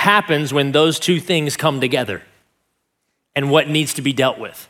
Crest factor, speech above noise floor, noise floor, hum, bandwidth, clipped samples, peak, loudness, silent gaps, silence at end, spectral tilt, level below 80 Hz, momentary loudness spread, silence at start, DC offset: 18 dB; 55 dB; -72 dBFS; none; 17.5 kHz; under 0.1%; 0 dBFS; -17 LUFS; none; 0.05 s; -4.5 dB/octave; -64 dBFS; 7 LU; 0 s; under 0.1%